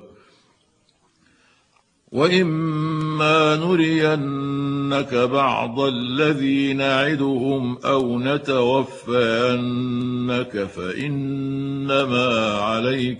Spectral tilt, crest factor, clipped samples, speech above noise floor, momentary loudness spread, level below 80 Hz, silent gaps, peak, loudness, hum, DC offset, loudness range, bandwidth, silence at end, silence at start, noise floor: -6.5 dB/octave; 18 dB; under 0.1%; 42 dB; 7 LU; -60 dBFS; none; -2 dBFS; -20 LUFS; none; under 0.1%; 3 LU; 10.5 kHz; 0 s; 0 s; -62 dBFS